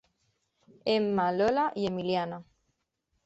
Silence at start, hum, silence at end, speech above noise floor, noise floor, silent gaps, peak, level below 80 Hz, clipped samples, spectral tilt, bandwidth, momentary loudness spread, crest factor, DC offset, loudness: 0.85 s; none; 0.85 s; 51 dB; -79 dBFS; none; -14 dBFS; -66 dBFS; under 0.1%; -6.5 dB/octave; 8.2 kHz; 10 LU; 16 dB; under 0.1%; -29 LUFS